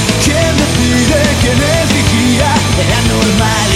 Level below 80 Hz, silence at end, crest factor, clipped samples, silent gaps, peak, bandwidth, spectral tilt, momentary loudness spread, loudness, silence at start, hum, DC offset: -22 dBFS; 0 s; 10 dB; under 0.1%; none; 0 dBFS; 16 kHz; -4 dB/octave; 1 LU; -10 LUFS; 0 s; none; under 0.1%